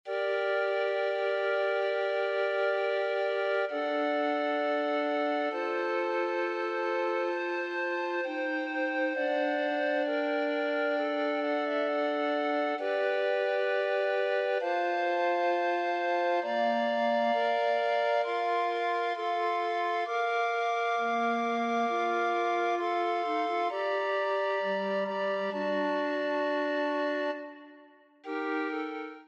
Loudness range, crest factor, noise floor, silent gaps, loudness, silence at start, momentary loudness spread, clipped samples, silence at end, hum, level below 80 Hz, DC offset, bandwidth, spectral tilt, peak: 2 LU; 12 dB; -57 dBFS; none; -30 LUFS; 0.05 s; 3 LU; under 0.1%; 0.05 s; none; under -90 dBFS; under 0.1%; 8.2 kHz; -4.5 dB/octave; -16 dBFS